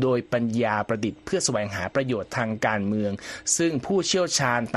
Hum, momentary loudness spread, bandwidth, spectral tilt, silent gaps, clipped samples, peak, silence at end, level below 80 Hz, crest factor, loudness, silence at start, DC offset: none; 6 LU; 13 kHz; -4 dB/octave; none; under 0.1%; -8 dBFS; 0 s; -58 dBFS; 18 dB; -25 LUFS; 0 s; under 0.1%